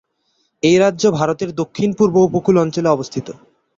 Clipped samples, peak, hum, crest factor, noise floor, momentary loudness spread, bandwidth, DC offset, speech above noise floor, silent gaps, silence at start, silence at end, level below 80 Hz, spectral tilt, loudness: under 0.1%; -2 dBFS; none; 14 dB; -65 dBFS; 10 LU; 7.8 kHz; under 0.1%; 50 dB; none; 0.65 s; 0.45 s; -54 dBFS; -6 dB/octave; -16 LUFS